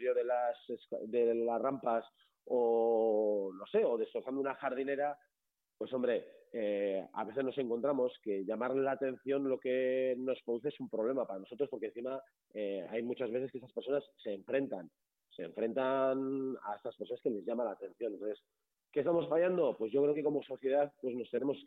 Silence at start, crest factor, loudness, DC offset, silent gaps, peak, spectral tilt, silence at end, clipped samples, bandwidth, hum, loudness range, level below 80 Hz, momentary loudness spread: 0 s; 14 dB; -36 LUFS; under 0.1%; none; -22 dBFS; -8.5 dB/octave; 0 s; under 0.1%; 4.1 kHz; none; 5 LU; -84 dBFS; 10 LU